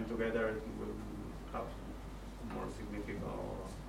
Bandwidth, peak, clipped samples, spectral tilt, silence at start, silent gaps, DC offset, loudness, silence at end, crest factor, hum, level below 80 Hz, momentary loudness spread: 16 kHz; -24 dBFS; under 0.1%; -6.5 dB/octave; 0 s; none; under 0.1%; -42 LUFS; 0 s; 18 dB; none; -50 dBFS; 12 LU